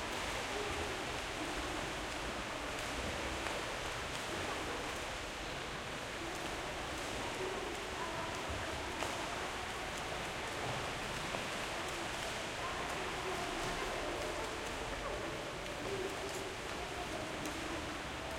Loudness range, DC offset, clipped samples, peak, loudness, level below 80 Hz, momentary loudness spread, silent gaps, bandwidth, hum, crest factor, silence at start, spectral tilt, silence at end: 2 LU; under 0.1%; under 0.1%; -20 dBFS; -40 LUFS; -54 dBFS; 3 LU; none; 16.5 kHz; none; 20 dB; 0 s; -3 dB/octave; 0 s